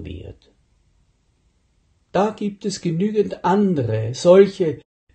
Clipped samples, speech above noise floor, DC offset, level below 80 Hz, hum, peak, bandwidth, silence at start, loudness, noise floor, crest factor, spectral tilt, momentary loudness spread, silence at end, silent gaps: under 0.1%; 45 dB; under 0.1%; -52 dBFS; none; -2 dBFS; 9 kHz; 0 s; -19 LUFS; -63 dBFS; 20 dB; -6.5 dB/octave; 13 LU; 0.4 s; none